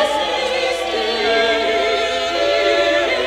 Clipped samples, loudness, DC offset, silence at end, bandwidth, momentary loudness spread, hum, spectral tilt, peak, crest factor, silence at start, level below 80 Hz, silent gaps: under 0.1%; -17 LUFS; under 0.1%; 0 s; 16 kHz; 4 LU; none; -2 dB/octave; -4 dBFS; 14 dB; 0 s; -46 dBFS; none